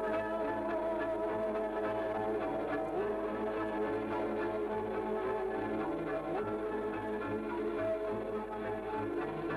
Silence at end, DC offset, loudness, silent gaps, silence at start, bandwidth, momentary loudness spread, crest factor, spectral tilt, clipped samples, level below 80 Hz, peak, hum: 0 s; under 0.1%; -36 LUFS; none; 0 s; 12.5 kHz; 2 LU; 10 dB; -7.5 dB/octave; under 0.1%; -58 dBFS; -26 dBFS; none